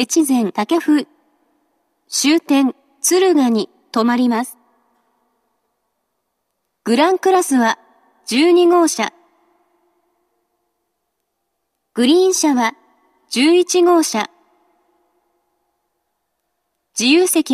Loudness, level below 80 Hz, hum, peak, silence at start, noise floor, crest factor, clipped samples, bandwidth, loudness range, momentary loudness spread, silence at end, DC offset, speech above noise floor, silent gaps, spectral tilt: -15 LUFS; -74 dBFS; none; 0 dBFS; 0 s; -73 dBFS; 18 dB; under 0.1%; 14.5 kHz; 6 LU; 11 LU; 0 s; under 0.1%; 59 dB; none; -2.5 dB/octave